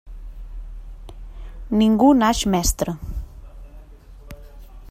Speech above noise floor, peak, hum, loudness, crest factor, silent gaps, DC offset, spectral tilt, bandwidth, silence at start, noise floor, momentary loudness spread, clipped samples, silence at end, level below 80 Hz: 25 dB; -4 dBFS; none; -18 LUFS; 18 dB; none; under 0.1%; -5 dB/octave; 16 kHz; 0.05 s; -42 dBFS; 27 LU; under 0.1%; 0 s; -34 dBFS